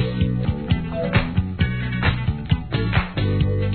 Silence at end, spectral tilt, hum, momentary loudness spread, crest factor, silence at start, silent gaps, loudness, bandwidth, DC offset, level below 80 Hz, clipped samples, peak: 0 s; -10.5 dB/octave; none; 3 LU; 16 dB; 0 s; none; -22 LUFS; 4.5 kHz; 0.2%; -30 dBFS; under 0.1%; -4 dBFS